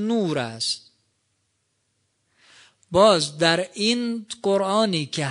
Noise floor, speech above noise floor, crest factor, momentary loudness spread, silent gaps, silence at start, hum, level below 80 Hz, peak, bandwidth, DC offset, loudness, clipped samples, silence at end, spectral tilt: -72 dBFS; 50 dB; 20 dB; 9 LU; none; 0 s; none; -62 dBFS; -4 dBFS; 10.5 kHz; under 0.1%; -22 LUFS; under 0.1%; 0 s; -4 dB/octave